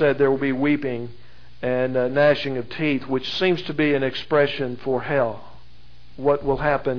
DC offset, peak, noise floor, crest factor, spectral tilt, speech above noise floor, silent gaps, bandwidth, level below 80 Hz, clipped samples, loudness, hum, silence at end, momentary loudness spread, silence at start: 2%; -6 dBFS; -51 dBFS; 16 dB; -7.5 dB/octave; 29 dB; none; 5.4 kHz; -48 dBFS; under 0.1%; -22 LUFS; none; 0 s; 9 LU; 0 s